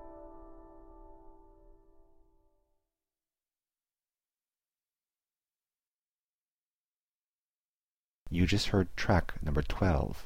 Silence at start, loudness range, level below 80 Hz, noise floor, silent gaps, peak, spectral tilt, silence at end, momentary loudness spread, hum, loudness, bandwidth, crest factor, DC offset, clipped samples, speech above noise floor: 0 s; 9 LU; -44 dBFS; under -90 dBFS; 5.79-8.26 s; -14 dBFS; -6 dB/octave; 0 s; 22 LU; none; -31 LUFS; 16 kHz; 24 dB; under 0.1%; under 0.1%; over 61 dB